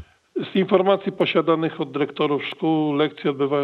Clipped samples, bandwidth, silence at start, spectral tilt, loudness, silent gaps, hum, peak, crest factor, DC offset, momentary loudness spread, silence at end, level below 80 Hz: under 0.1%; 5.8 kHz; 0 s; -8 dB/octave; -22 LUFS; none; none; -4 dBFS; 16 dB; under 0.1%; 7 LU; 0 s; -70 dBFS